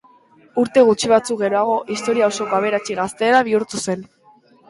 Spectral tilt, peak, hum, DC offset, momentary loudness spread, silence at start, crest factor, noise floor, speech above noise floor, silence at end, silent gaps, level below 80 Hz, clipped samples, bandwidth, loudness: -4 dB/octave; -2 dBFS; none; under 0.1%; 10 LU; 0.55 s; 18 dB; -52 dBFS; 34 dB; 0.65 s; none; -60 dBFS; under 0.1%; 11.5 kHz; -18 LUFS